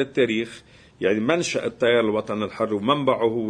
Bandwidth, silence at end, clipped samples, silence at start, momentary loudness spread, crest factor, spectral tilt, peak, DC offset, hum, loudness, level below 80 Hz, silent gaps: 10.5 kHz; 0 s; under 0.1%; 0 s; 7 LU; 18 dB; -5 dB/octave; -4 dBFS; under 0.1%; none; -22 LUFS; -60 dBFS; none